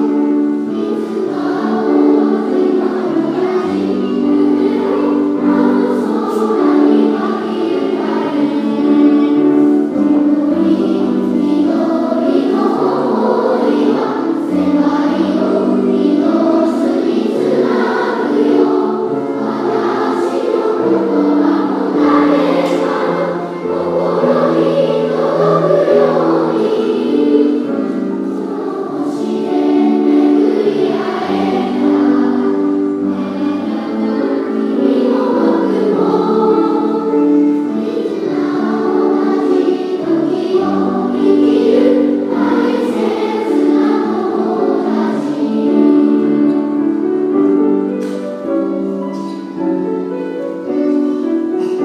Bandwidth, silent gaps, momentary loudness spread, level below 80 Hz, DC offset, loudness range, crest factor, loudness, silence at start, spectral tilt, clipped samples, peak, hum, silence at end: 8.2 kHz; none; 7 LU; -66 dBFS; under 0.1%; 2 LU; 14 dB; -14 LUFS; 0 s; -7.5 dB/octave; under 0.1%; 0 dBFS; none; 0 s